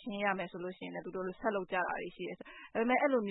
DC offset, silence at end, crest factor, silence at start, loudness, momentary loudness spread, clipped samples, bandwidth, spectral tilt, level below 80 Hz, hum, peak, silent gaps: under 0.1%; 0 s; 18 dB; 0 s; -36 LUFS; 13 LU; under 0.1%; 3.9 kHz; -0.5 dB/octave; -70 dBFS; none; -18 dBFS; none